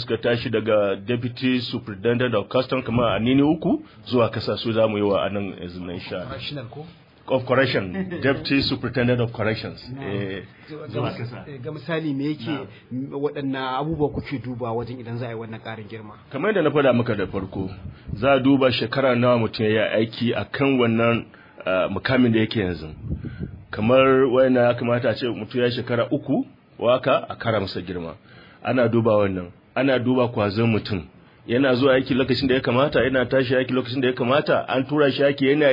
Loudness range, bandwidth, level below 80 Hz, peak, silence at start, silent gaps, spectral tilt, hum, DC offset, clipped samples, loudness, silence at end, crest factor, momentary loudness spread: 7 LU; 5.4 kHz; -50 dBFS; -6 dBFS; 0 s; none; -9 dB/octave; none; under 0.1%; under 0.1%; -22 LUFS; 0 s; 16 dB; 14 LU